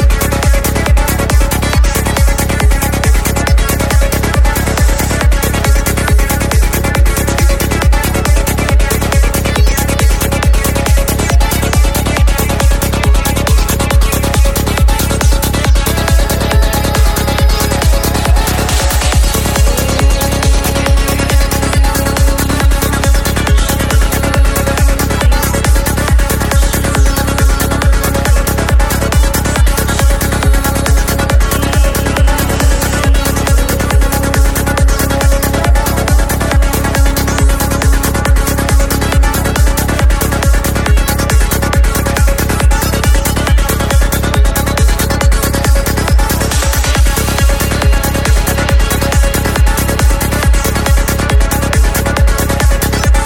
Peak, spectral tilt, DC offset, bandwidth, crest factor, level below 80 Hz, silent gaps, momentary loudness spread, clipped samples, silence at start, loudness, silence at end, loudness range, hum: 0 dBFS; -4.5 dB/octave; under 0.1%; 17 kHz; 10 dB; -12 dBFS; none; 1 LU; under 0.1%; 0 s; -12 LUFS; 0 s; 0 LU; none